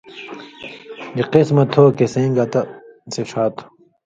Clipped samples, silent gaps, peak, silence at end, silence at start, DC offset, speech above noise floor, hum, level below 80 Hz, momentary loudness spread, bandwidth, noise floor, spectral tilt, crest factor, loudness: under 0.1%; none; 0 dBFS; 0.45 s; 0.1 s; under 0.1%; 20 dB; none; -58 dBFS; 21 LU; 7.8 kHz; -36 dBFS; -7 dB/octave; 18 dB; -17 LUFS